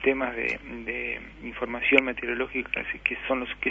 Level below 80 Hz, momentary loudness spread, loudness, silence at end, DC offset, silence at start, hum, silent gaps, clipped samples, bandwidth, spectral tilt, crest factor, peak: -50 dBFS; 12 LU; -27 LUFS; 0 s; under 0.1%; 0 s; 50 Hz at -50 dBFS; none; under 0.1%; 7.8 kHz; -5.5 dB/octave; 26 dB; -2 dBFS